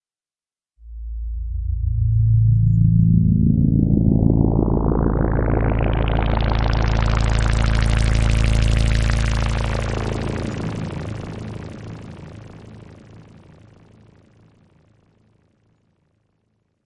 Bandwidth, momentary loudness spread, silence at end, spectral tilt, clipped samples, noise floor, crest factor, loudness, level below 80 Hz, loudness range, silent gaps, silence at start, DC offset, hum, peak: 11 kHz; 18 LU; 3.65 s; -7 dB/octave; under 0.1%; under -90 dBFS; 18 dB; -19 LUFS; -24 dBFS; 15 LU; none; 0.85 s; under 0.1%; none; -2 dBFS